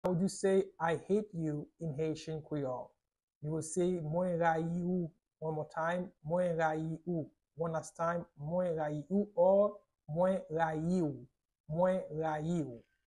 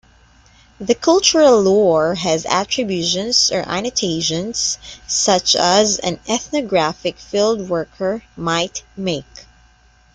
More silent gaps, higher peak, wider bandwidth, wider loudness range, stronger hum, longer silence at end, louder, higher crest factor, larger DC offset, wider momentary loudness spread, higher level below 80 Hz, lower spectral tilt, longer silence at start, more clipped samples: first, 3.23-3.28 s, 3.35-3.41 s, 11.60-11.64 s vs none; second, -18 dBFS vs 0 dBFS; about the same, 11.5 kHz vs 11 kHz; about the same, 4 LU vs 6 LU; neither; second, 0.3 s vs 0.75 s; second, -35 LUFS vs -17 LUFS; about the same, 18 dB vs 18 dB; neither; about the same, 10 LU vs 11 LU; second, -68 dBFS vs -50 dBFS; first, -7 dB/octave vs -3 dB/octave; second, 0.05 s vs 0.8 s; neither